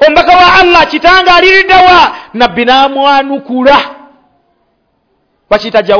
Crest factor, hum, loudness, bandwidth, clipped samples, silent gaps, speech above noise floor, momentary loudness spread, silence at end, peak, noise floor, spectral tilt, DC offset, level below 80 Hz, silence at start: 6 dB; none; -5 LUFS; 5.4 kHz; 9%; none; 51 dB; 8 LU; 0 s; 0 dBFS; -57 dBFS; -4 dB/octave; under 0.1%; -34 dBFS; 0 s